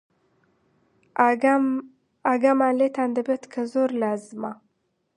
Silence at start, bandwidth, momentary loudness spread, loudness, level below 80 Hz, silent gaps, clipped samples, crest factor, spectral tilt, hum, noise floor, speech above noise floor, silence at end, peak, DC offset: 1.15 s; 10.5 kHz; 13 LU; -23 LUFS; -78 dBFS; none; under 0.1%; 20 dB; -6 dB/octave; none; -73 dBFS; 50 dB; 0.6 s; -4 dBFS; under 0.1%